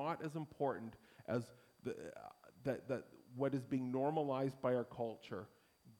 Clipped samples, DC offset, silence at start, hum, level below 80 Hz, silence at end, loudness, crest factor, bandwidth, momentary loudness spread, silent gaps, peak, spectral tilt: under 0.1%; under 0.1%; 0 s; none; -78 dBFS; 0.05 s; -42 LUFS; 18 dB; 17.5 kHz; 17 LU; none; -24 dBFS; -7.5 dB/octave